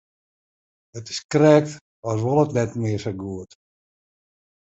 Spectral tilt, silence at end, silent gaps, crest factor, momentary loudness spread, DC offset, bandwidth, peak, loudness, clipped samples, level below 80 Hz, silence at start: -6.5 dB/octave; 1.25 s; 1.24-1.29 s, 1.81-2.03 s; 22 dB; 19 LU; under 0.1%; 8.2 kHz; -2 dBFS; -21 LUFS; under 0.1%; -56 dBFS; 0.95 s